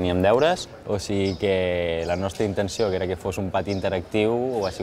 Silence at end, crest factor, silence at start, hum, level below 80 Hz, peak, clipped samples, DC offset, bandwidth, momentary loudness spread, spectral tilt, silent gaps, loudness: 0 s; 16 dB; 0 s; none; -48 dBFS; -6 dBFS; under 0.1%; under 0.1%; 15.5 kHz; 7 LU; -5.5 dB/octave; none; -24 LUFS